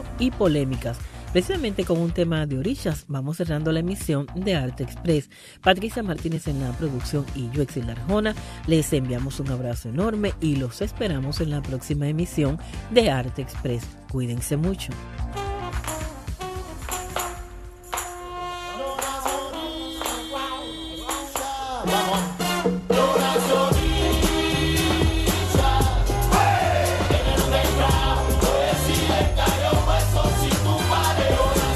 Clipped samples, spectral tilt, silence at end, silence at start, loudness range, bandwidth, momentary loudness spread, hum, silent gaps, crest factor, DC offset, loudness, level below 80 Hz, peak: under 0.1%; -5 dB/octave; 0 s; 0 s; 9 LU; 14.5 kHz; 11 LU; none; none; 20 dB; under 0.1%; -24 LUFS; -30 dBFS; -2 dBFS